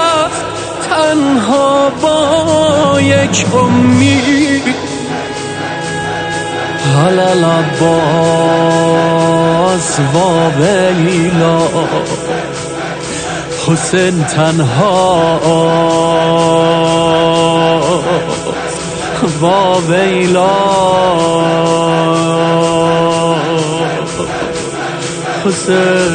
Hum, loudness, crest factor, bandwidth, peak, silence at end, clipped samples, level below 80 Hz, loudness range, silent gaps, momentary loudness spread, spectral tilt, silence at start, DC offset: none; -11 LUFS; 10 dB; 9.6 kHz; 0 dBFS; 0 s; under 0.1%; -40 dBFS; 4 LU; none; 8 LU; -5 dB/octave; 0 s; under 0.1%